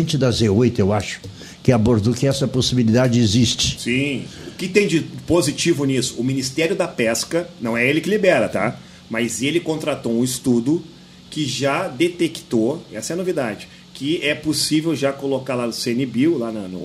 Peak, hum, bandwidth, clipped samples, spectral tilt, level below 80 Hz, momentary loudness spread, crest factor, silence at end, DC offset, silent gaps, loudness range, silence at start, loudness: 0 dBFS; none; 15.5 kHz; under 0.1%; -5 dB/octave; -48 dBFS; 9 LU; 18 dB; 0 s; under 0.1%; none; 4 LU; 0 s; -19 LUFS